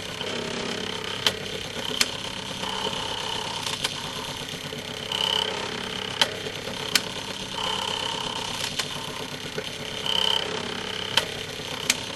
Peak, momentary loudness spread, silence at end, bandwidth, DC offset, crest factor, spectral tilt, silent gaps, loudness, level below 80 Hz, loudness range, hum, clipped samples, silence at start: 0 dBFS; 8 LU; 0 s; 15.5 kHz; under 0.1%; 30 dB; -2 dB/octave; none; -27 LUFS; -54 dBFS; 2 LU; none; under 0.1%; 0 s